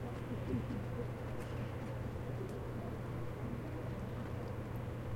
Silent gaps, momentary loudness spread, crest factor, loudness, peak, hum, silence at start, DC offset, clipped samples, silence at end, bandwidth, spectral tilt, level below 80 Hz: none; 3 LU; 14 dB; -43 LUFS; -26 dBFS; none; 0 s; under 0.1%; under 0.1%; 0 s; 16.5 kHz; -8 dB/octave; -52 dBFS